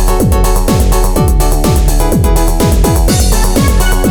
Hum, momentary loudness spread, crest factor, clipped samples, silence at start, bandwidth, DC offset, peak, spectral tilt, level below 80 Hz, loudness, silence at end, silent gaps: none; 1 LU; 8 dB; under 0.1%; 0 s; over 20 kHz; under 0.1%; 0 dBFS; -5 dB/octave; -10 dBFS; -11 LUFS; 0 s; none